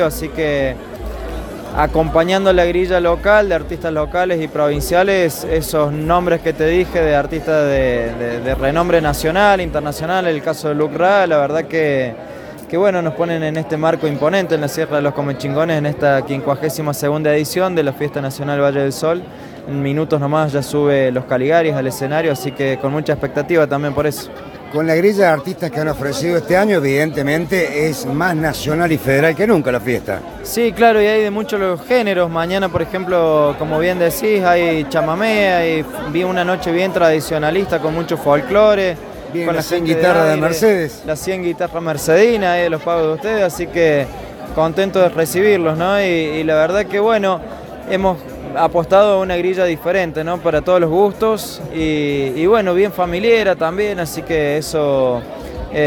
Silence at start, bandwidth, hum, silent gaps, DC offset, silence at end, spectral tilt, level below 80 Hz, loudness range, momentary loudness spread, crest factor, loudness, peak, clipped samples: 0 s; 18 kHz; none; none; under 0.1%; 0 s; -5.5 dB/octave; -36 dBFS; 2 LU; 8 LU; 16 dB; -16 LUFS; 0 dBFS; under 0.1%